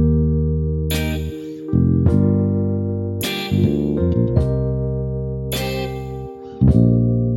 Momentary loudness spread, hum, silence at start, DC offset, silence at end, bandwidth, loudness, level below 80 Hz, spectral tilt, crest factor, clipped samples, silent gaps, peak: 10 LU; none; 0 s; under 0.1%; 0 s; 17 kHz; -19 LUFS; -28 dBFS; -7.5 dB/octave; 16 dB; under 0.1%; none; -2 dBFS